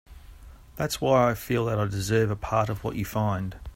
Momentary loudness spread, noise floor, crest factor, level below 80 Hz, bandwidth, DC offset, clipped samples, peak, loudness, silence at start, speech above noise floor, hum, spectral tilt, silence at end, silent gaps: 9 LU; -47 dBFS; 18 dB; -46 dBFS; 16.5 kHz; under 0.1%; under 0.1%; -8 dBFS; -26 LUFS; 0.1 s; 21 dB; none; -6 dB/octave; 0 s; none